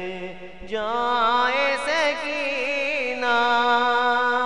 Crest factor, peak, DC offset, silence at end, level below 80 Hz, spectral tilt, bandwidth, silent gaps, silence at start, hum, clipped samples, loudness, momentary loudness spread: 14 dB; -8 dBFS; 0.9%; 0 s; -56 dBFS; -2.5 dB/octave; 10.5 kHz; none; 0 s; none; under 0.1%; -21 LUFS; 13 LU